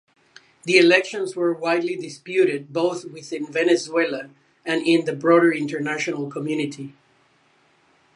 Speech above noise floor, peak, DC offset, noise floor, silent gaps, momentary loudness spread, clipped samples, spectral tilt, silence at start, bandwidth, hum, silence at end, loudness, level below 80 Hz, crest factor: 39 dB; -2 dBFS; under 0.1%; -60 dBFS; none; 16 LU; under 0.1%; -4.5 dB/octave; 0.65 s; 11 kHz; none; 1.25 s; -21 LUFS; -78 dBFS; 20 dB